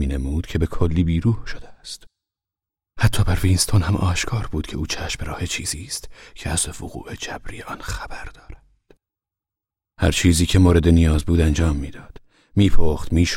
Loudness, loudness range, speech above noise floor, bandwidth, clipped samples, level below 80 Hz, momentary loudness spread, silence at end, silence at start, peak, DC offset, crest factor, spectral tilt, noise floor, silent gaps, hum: -21 LUFS; 11 LU; 69 dB; 16 kHz; under 0.1%; -28 dBFS; 18 LU; 0 s; 0 s; -2 dBFS; under 0.1%; 18 dB; -5 dB/octave; -88 dBFS; none; none